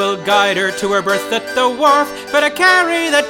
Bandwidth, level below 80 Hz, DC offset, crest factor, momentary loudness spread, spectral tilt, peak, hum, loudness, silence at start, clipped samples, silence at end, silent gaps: 18 kHz; -54 dBFS; under 0.1%; 14 dB; 6 LU; -2.5 dB/octave; 0 dBFS; none; -14 LUFS; 0 s; under 0.1%; 0 s; none